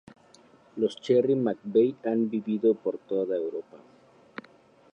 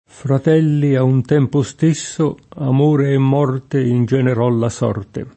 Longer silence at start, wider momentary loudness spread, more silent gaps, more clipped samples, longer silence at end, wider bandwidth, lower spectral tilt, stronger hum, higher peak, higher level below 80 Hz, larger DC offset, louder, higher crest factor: first, 0.75 s vs 0.25 s; first, 21 LU vs 6 LU; neither; neither; first, 1.15 s vs 0.05 s; about the same, 8.6 kHz vs 8.6 kHz; about the same, -7.5 dB/octave vs -7.5 dB/octave; neither; second, -12 dBFS vs -2 dBFS; second, -78 dBFS vs -54 dBFS; neither; second, -27 LUFS vs -16 LUFS; about the same, 16 dB vs 14 dB